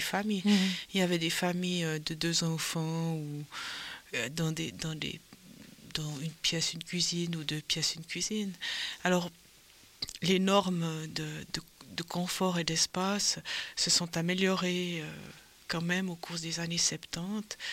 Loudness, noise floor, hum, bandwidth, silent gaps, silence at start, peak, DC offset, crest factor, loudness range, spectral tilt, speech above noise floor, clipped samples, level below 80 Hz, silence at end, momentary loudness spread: -32 LUFS; -58 dBFS; none; 16.5 kHz; none; 0 s; -10 dBFS; under 0.1%; 22 dB; 5 LU; -3.5 dB/octave; 26 dB; under 0.1%; -64 dBFS; 0 s; 12 LU